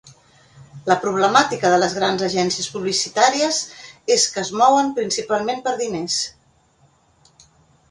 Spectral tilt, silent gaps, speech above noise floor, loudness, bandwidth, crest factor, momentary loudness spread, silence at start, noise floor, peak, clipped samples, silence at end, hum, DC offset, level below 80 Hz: -2.5 dB/octave; none; 39 dB; -19 LUFS; 11.5 kHz; 20 dB; 8 LU; 0.05 s; -58 dBFS; 0 dBFS; under 0.1%; 1.6 s; none; under 0.1%; -60 dBFS